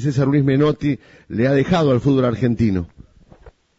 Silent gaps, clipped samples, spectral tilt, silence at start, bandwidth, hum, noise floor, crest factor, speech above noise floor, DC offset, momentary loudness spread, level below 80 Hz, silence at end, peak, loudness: none; under 0.1%; -8 dB/octave; 0 s; 7.8 kHz; none; -47 dBFS; 12 dB; 30 dB; under 0.1%; 10 LU; -42 dBFS; 0.3 s; -6 dBFS; -18 LUFS